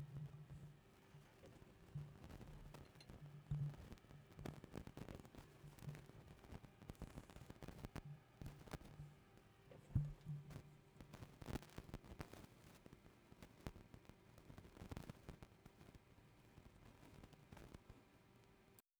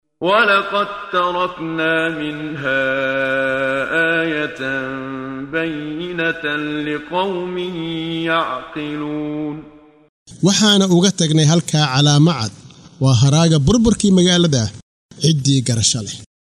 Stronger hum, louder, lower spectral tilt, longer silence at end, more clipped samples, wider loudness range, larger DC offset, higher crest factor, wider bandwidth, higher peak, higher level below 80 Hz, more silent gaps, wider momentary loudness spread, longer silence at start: neither; second, -57 LUFS vs -17 LUFS; first, -6.5 dB/octave vs -4.5 dB/octave; about the same, 0.2 s vs 0.3 s; neither; about the same, 9 LU vs 8 LU; neither; first, 28 dB vs 14 dB; first, over 20 kHz vs 12.5 kHz; second, -28 dBFS vs -2 dBFS; second, -66 dBFS vs -44 dBFS; second, none vs 10.09-10.26 s, 14.82-15.09 s; first, 16 LU vs 12 LU; second, 0 s vs 0.2 s